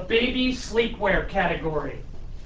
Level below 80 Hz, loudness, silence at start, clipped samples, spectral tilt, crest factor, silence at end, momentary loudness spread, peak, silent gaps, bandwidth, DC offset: -36 dBFS; -24 LUFS; 0 s; under 0.1%; -5 dB/octave; 16 dB; 0 s; 14 LU; -8 dBFS; none; 8 kHz; under 0.1%